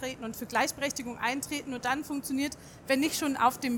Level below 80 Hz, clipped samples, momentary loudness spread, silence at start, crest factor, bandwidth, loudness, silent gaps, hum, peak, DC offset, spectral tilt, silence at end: -62 dBFS; under 0.1%; 8 LU; 0 s; 20 dB; 19.5 kHz; -31 LUFS; none; none; -12 dBFS; under 0.1%; -2.5 dB/octave; 0 s